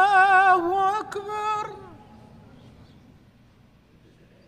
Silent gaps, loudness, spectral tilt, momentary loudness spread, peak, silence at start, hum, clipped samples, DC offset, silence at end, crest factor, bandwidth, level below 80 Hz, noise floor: none; -21 LUFS; -4 dB/octave; 17 LU; -8 dBFS; 0 s; none; under 0.1%; under 0.1%; 2.6 s; 16 dB; 10 kHz; -60 dBFS; -56 dBFS